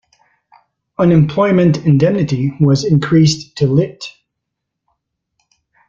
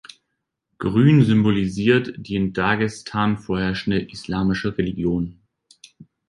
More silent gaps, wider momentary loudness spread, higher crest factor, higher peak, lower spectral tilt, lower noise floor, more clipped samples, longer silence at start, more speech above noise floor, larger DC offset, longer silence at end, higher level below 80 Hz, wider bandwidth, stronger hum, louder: neither; about the same, 9 LU vs 10 LU; about the same, 14 dB vs 18 dB; first, 0 dBFS vs -4 dBFS; about the same, -7 dB/octave vs -7 dB/octave; about the same, -77 dBFS vs -78 dBFS; neither; first, 1 s vs 0.8 s; first, 65 dB vs 58 dB; neither; first, 1.8 s vs 0.25 s; about the same, -48 dBFS vs -46 dBFS; second, 7.6 kHz vs 11 kHz; neither; first, -13 LUFS vs -21 LUFS